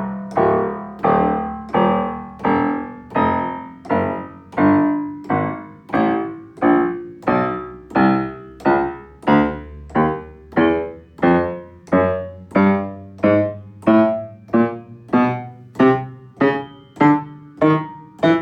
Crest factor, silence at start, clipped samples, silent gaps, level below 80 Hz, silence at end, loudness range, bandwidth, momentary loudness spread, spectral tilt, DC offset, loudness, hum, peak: 14 dB; 0 s; under 0.1%; none; -46 dBFS; 0 s; 2 LU; 6.4 kHz; 12 LU; -9 dB/octave; under 0.1%; -19 LUFS; none; -4 dBFS